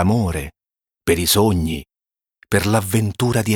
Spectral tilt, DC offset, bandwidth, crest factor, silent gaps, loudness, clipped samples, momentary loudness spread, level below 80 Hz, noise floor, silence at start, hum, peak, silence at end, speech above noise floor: -5 dB/octave; under 0.1%; 19.5 kHz; 16 dB; none; -19 LUFS; under 0.1%; 12 LU; -38 dBFS; under -90 dBFS; 0 s; none; -2 dBFS; 0 s; over 73 dB